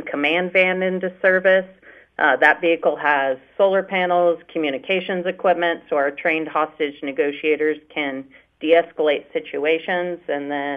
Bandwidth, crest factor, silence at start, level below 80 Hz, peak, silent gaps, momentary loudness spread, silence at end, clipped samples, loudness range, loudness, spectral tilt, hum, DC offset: 5.6 kHz; 18 dB; 0 s; -68 dBFS; -2 dBFS; none; 9 LU; 0 s; under 0.1%; 4 LU; -20 LUFS; -6.5 dB/octave; none; under 0.1%